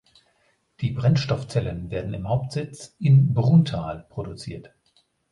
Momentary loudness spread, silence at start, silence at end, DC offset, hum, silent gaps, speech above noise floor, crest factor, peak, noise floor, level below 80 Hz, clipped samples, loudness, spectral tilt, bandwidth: 17 LU; 0.8 s; 0.65 s; under 0.1%; none; none; 44 dB; 16 dB; -6 dBFS; -66 dBFS; -48 dBFS; under 0.1%; -23 LUFS; -8 dB/octave; 11 kHz